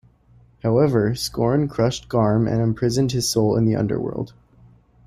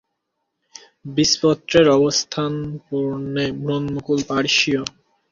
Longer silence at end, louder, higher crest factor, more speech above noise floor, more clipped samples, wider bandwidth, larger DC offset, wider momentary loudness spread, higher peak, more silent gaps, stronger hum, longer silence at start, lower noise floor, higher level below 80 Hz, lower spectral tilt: first, 0.8 s vs 0.4 s; about the same, -20 LUFS vs -19 LUFS; about the same, 14 dB vs 18 dB; second, 34 dB vs 57 dB; neither; first, 15.5 kHz vs 7.6 kHz; neither; second, 7 LU vs 12 LU; second, -6 dBFS vs -2 dBFS; neither; neither; second, 0.65 s vs 1.05 s; second, -53 dBFS vs -76 dBFS; first, -46 dBFS vs -52 dBFS; first, -6 dB/octave vs -4 dB/octave